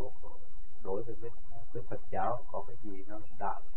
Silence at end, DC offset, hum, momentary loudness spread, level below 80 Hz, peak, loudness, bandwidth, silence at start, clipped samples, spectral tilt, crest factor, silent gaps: 0 s; 6%; none; 20 LU; -50 dBFS; -16 dBFS; -41 LUFS; 3.8 kHz; 0 s; under 0.1%; -10 dB/octave; 20 dB; none